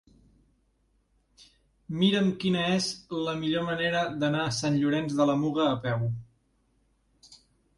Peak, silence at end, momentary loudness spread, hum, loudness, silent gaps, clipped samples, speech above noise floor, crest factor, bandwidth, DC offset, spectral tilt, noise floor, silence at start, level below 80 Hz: -12 dBFS; 0.4 s; 6 LU; none; -27 LUFS; none; under 0.1%; 43 dB; 18 dB; 11.5 kHz; under 0.1%; -5.5 dB/octave; -70 dBFS; 1.9 s; -62 dBFS